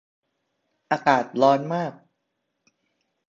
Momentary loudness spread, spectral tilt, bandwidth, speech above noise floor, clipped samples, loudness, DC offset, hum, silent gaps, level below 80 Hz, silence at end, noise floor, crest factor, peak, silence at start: 9 LU; -6 dB/octave; 7.4 kHz; 56 dB; under 0.1%; -22 LUFS; under 0.1%; none; none; -70 dBFS; 1.35 s; -78 dBFS; 22 dB; -4 dBFS; 0.9 s